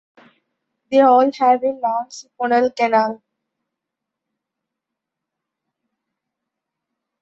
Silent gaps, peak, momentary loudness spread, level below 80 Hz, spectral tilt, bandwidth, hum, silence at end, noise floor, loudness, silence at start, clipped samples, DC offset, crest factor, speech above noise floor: none; -2 dBFS; 13 LU; -70 dBFS; -4.5 dB/octave; 8 kHz; none; 4.05 s; -83 dBFS; -17 LUFS; 0.9 s; under 0.1%; under 0.1%; 18 dB; 66 dB